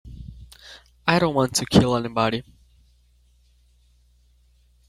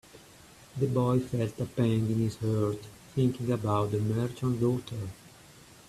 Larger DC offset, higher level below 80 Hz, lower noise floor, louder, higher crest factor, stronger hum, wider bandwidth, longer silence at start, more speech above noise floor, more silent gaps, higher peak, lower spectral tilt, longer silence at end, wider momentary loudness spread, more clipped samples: neither; first, -48 dBFS vs -58 dBFS; first, -59 dBFS vs -54 dBFS; first, -21 LUFS vs -30 LUFS; first, 24 dB vs 16 dB; first, 60 Hz at -50 dBFS vs none; first, 16 kHz vs 14 kHz; about the same, 0.05 s vs 0.15 s; first, 38 dB vs 25 dB; neither; first, -2 dBFS vs -14 dBFS; second, -5 dB/octave vs -8 dB/octave; first, 2.45 s vs 0.6 s; first, 25 LU vs 12 LU; neither